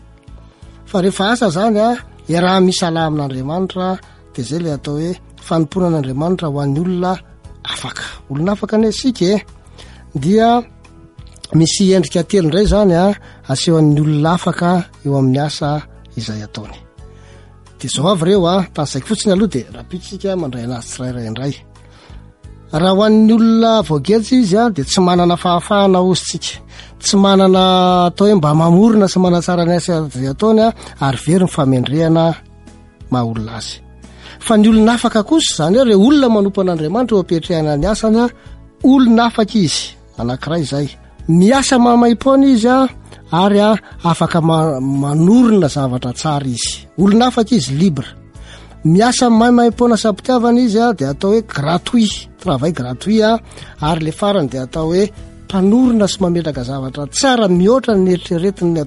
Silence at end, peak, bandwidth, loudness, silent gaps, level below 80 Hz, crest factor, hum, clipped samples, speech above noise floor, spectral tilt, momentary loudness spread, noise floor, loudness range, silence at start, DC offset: 0 s; -2 dBFS; 11.5 kHz; -14 LUFS; none; -38 dBFS; 12 dB; none; under 0.1%; 27 dB; -6 dB/octave; 13 LU; -40 dBFS; 7 LU; 0.3 s; under 0.1%